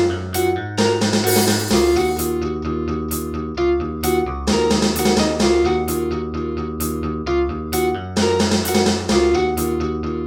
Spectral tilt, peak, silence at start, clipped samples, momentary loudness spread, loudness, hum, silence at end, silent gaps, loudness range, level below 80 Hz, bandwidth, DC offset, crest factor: -4.5 dB/octave; -4 dBFS; 0 s; under 0.1%; 7 LU; -19 LUFS; none; 0 s; none; 2 LU; -34 dBFS; 19 kHz; under 0.1%; 16 dB